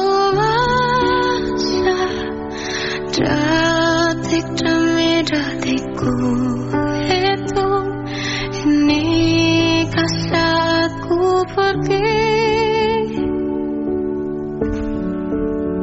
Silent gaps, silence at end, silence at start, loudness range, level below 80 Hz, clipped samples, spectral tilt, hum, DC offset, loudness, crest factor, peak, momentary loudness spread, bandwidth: none; 0 s; 0 s; 3 LU; -36 dBFS; under 0.1%; -4 dB/octave; none; under 0.1%; -17 LUFS; 14 dB; -4 dBFS; 7 LU; 8 kHz